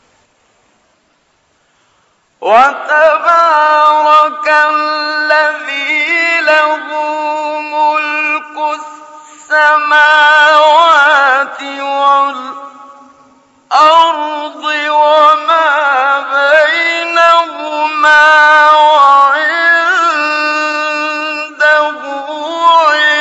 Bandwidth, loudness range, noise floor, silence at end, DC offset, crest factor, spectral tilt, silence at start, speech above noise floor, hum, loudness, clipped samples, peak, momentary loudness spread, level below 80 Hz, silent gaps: 8.4 kHz; 5 LU; -56 dBFS; 0 s; under 0.1%; 10 dB; -0.5 dB/octave; 2.4 s; 48 dB; none; -9 LUFS; 0.3%; 0 dBFS; 12 LU; -62 dBFS; none